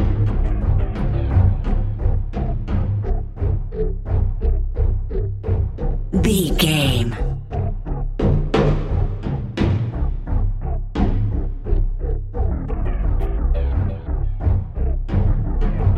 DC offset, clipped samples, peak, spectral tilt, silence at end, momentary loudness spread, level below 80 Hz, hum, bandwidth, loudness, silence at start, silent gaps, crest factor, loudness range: under 0.1%; under 0.1%; -2 dBFS; -6.5 dB/octave; 0 s; 8 LU; -20 dBFS; none; 14 kHz; -22 LUFS; 0 s; none; 16 dB; 4 LU